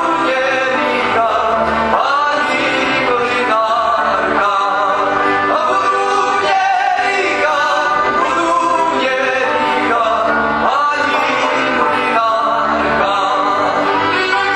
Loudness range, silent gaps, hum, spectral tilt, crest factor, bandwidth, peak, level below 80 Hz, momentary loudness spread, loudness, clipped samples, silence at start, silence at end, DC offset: 0 LU; none; none; -3.5 dB/octave; 14 dB; 11.5 kHz; 0 dBFS; -46 dBFS; 1 LU; -14 LUFS; under 0.1%; 0 s; 0 s; under 0.1%